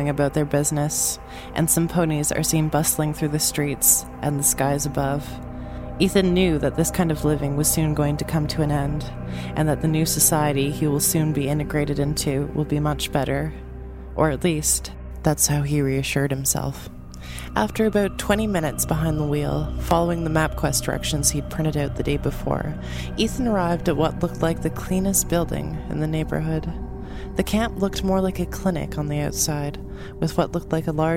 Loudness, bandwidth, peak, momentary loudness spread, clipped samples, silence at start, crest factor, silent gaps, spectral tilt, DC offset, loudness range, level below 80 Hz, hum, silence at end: -22 LUFS; 16.5 kHz; -2 dBFS; 10 LU; under 0.1%; 0 s; 20 dB; none; -4.5 dB/octave; under 0.1%; 4 LU; -36 dBFS; none; 0 s